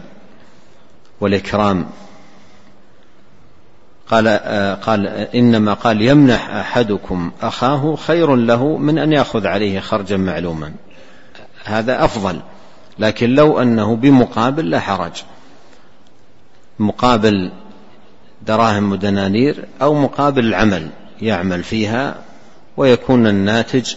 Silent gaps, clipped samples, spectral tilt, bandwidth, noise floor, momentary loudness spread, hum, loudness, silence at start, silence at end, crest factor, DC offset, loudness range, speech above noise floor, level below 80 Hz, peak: none; under 0.1%; -6.5 dB/octave; 8 kHz; -51 dBFS; 11 LU; none; -15 LUFS; 1.2 s; 0 s; 16 dB; 2%; 6 LU; 36 dB; -42 dBFS; 0 dBFS